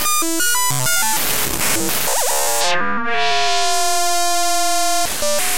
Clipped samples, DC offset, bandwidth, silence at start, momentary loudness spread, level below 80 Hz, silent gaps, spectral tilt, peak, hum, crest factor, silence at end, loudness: under 0.1%; 9%; 16 kHz; 0 s; 2 LU; -44 dBFS; none; -1 dB/octave; 0 dBFS; none; 18 dB; 0 s; -16 LUFS